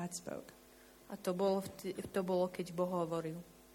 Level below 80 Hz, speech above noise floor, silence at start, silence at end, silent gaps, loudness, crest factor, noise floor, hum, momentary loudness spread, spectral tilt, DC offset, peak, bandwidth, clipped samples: -72 dBFS; 23 dB; 0 s; 0 s; none; -39 LUFS; 16 dB; -61 dBFS; none; 14 LU; -6 dB/octave; under 0.1%; -22 dBFS; 18 kHz; under 0.1%